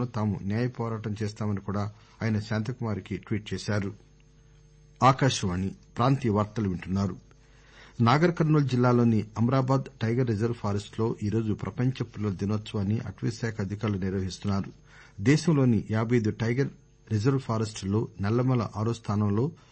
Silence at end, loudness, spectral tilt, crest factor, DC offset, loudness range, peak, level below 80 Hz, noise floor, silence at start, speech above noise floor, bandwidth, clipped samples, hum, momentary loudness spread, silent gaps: 0.15 s; -28 LUFS; -7 dB/octave; 18 dB; under 0.1%; 6 LU; -10 dBFS; -56 dBFS; -56 dBFS; 0 s; 29 dB; 8.8 kHz; under 0.1%; none; 10 LU; none